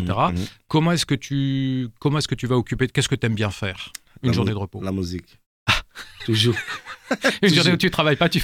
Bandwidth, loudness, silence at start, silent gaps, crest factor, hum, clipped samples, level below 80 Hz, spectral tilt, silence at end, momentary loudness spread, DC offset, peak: 16.5 kHz; -22 LUFS; 0 s; 5.46-5.66 s; 16 dB; none; under 0.1%; -44 dBFS; -5 dB/octave; 0 s; 12 LU; under 0.1%; -4 dBFS